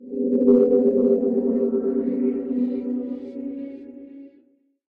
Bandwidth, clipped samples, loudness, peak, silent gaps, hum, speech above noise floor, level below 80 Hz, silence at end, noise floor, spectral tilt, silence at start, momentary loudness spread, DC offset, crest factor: 2.6 kHz; under 0.1%; -21 LUFS; -6 dBFS; none; none; 41 dB; -62 dBFS; 0.65 s; -60 dBFS; -11.5 dB/octave; 0 s; 18 LU; under 0.1%; 16 dB